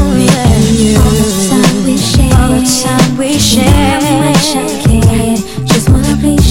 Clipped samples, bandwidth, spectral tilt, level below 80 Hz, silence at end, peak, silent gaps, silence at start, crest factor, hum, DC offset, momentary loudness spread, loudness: 0.6%; 17 kHz; -5 dB/octave; -18 dBFS; 0 s; 0 dBFS; none; 0 s; 8 dB; none; under 0.1%; 3 LU; -9 LUFS